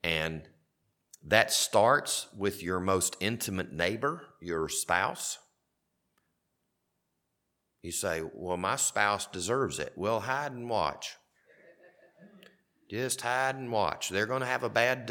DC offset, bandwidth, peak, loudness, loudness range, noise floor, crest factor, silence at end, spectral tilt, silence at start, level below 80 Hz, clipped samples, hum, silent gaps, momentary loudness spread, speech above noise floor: under 0.1%; 18.5 kHz; -4 dBFS; -30 LUFS; 8 LU; -81 dBFS; 28 dB; 0 s; -3 dB/octave; 0.05 s; -62 dBFS; under 0.1%; none; none; 11 LU; 50 dB